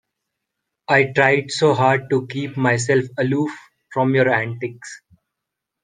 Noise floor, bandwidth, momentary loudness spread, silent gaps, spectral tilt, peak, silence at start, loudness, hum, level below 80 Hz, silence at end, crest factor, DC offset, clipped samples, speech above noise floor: -82 dBFS; 9.8 kHz; 14 LU; none; -5.5 dB/octave; 0 dBFS; 0.9 s; -19 LUFS; none; -62 dBFS; 0.85 s; 20 dB; under 0.1%; under 0.1%; 63 dB